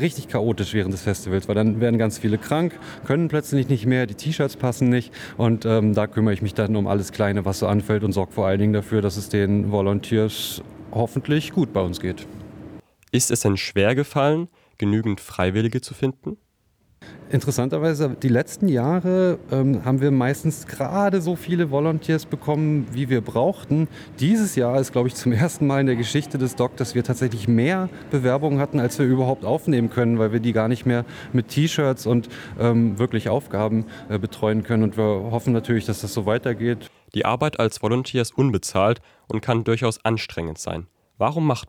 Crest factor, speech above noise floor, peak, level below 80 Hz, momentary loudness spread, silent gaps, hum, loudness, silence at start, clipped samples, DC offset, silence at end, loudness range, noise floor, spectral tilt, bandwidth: 16 dB; 41 dB; -6 dBFS; -56 dBFS; 7 LU; none; none; -22 LUFS; 0 s; under 0.1%; under 0.1%; 0 s; 2 LU; -63 dBFS; -6.5 dB/octave; 18.5 kHz